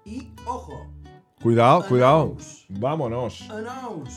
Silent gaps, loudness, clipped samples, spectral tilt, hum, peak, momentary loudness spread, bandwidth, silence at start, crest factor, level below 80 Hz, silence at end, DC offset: none; -21 LUFS; under 0.1%; -7 dB/octave; none; -4 dBFS; 21 LU; 11.5 kHz; 0.05 s; 20 dB; -48 dBFS; 0 s; under 0.1%